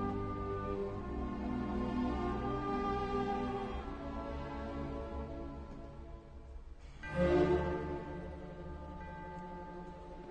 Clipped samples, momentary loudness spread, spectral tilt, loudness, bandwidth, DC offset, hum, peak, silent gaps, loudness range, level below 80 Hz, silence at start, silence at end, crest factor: under 0.1%; 15 LU; -8 dB/octave; -39 LUFS; 9 kHz; under 0.1%; none; -20 dBFS; none; 6 LU; -48 dBFS; 0 s; 0 s; 18 dB